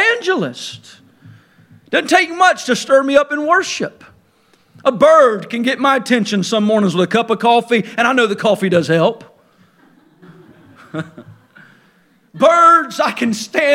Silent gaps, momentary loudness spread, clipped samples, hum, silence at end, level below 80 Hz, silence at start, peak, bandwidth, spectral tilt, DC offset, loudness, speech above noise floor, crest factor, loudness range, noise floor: none; 15 LU; under 0.1%; none; 0 s; -64 dBFS; 0 s; 0 dBFS; 16 kHz; -4.5 dB/octave; under 0.1%; -14 LUFS; 41 dB; 16 dB; 6 LU; -54 dBFS